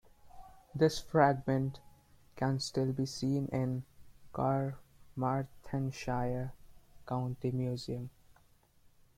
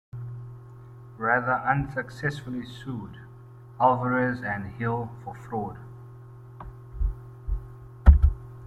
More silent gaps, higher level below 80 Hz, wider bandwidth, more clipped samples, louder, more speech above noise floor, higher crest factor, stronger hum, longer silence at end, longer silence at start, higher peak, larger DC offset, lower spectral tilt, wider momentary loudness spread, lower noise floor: neither; second, -58 dBFS vs -30 dBFS; first, 15 kHz vs 5.2 kHz; neither; second, -34 LUFS vs -27 LUFS; first, 32 dB vs 19 dB; about the same, 22 dB vs 24 dB; neither; first, 1.1 s vs 0 s; about the same, 0.25 s vs 0.15 s; second, -12 dBFS vs -2 dBFS; neither; second, -6.5 dB/octave vs -8.5 dB/octave; second, 14 LU vs 24 LU; first, -65 dBFS vs -46 dBFS